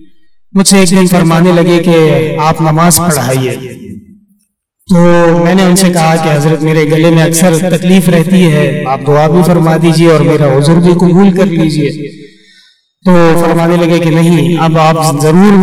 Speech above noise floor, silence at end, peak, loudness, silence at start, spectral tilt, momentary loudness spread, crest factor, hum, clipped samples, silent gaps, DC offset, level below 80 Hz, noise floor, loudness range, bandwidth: 51 dB; 0 s; 0 dBFS; -7 LUFS; 0 s; -6 dB/octave; 5 LU; 8 dB; none; 1%; none; under 0.1%; -38 dBFS; -58 dBFS; 3 LU; 16 kHz